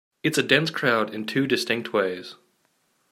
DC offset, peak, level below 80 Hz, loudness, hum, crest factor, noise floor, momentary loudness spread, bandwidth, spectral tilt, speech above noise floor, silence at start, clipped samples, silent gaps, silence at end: under 0.1%; -4 dBFS; -72 dBFS; -23 LUFS; none; 22 dB; -68 dBFS; 8 LU; 16 kHz; -4 dB/octave; 45 dB; 0.25 s; under 0.1%; none; 0.75 s